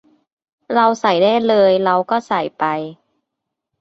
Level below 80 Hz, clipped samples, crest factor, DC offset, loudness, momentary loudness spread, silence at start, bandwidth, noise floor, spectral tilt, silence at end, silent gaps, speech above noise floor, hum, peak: -64 dBFS; under 0.1%; 16 dB; under 0.1%; -16 LUFS; 8 LU; 0.7 s; 7.8 kHz; -79 dBFS; -5.5 dB/octave; 0.9 s; none; 64 dB; none; -2 dBFS